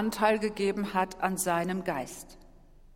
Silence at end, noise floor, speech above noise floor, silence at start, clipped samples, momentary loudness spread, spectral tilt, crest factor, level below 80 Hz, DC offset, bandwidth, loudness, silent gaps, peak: 0.1 s; -54 dBFS; 24 dB; 0 s; under 0.1%; 14 LU; -4.5 dB/octave; 20 dB; -56 dBFS; under 0.1%; 17 kHz; -29 LUFS; none; -10 dBFS